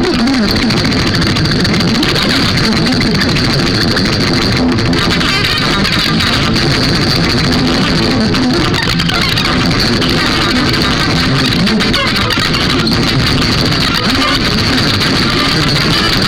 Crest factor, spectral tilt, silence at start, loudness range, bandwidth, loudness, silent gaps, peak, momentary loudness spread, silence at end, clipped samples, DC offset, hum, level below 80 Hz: 10 dB; -4.5 dB/octave; 0 s; 0 LU; 19 kHz; -11 LUFS; none; -2 dBFS; 1 LU; 0 s; under 0.1%; under 0.1%; none; -26 dBFS